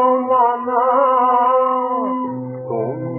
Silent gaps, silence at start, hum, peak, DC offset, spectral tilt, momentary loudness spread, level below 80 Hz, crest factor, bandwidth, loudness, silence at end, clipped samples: none; 0 s; none; -4 dBFS; under 0.1%; -11 dB/octave; 10 LU; -78 dBFS; 12 dB; 3.1 kHz; -17 LUFS; 0 s; under 0.1%